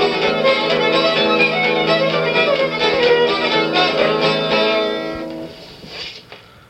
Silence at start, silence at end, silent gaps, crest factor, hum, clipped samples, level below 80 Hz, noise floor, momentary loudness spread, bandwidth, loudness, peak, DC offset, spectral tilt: 0 s; 0.3 s; none; 14 dB; none; under 0.1%; -52 dBFS; -41 dBFS; 15 LU; 12 kHz; -15 LUFS; -2 dBFS; under 0.1%; -4.5 dB/octave